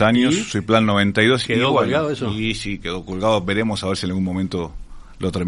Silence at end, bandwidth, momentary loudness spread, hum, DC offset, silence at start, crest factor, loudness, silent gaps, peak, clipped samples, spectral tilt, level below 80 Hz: 0 s; 11.5 kHz; 10 LU; none; under 0.1%; 0 s; 18 dB; -19 LUFS; none; 0 dBFS; under 0.1%; -5.5 dB/octave; -42 dBFS